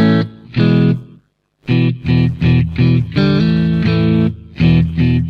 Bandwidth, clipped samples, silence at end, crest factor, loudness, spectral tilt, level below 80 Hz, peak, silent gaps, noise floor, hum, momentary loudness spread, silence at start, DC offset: 5.6 kHz; under 0.1%; 0 s; 12 dB; -14 LUFS; -9.5 dB/octave; -32 dBFS; -2 dBFS; none; -52 dBFS; none; 5 LU; 0 s; under 0.1%